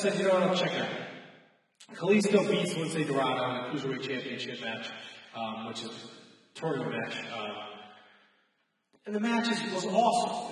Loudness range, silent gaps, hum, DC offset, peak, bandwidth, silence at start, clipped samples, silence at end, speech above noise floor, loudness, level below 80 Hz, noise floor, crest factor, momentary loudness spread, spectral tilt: 9 LU; none; none; under 0.1%; -12 dBFS; 12 kHz; 0 s; under 0.1%; 0 s; 45 dB; -30 LUFS; -84 dBFS; -75 dBFS; 20 dB; 18 LU; -4.5 dB/octave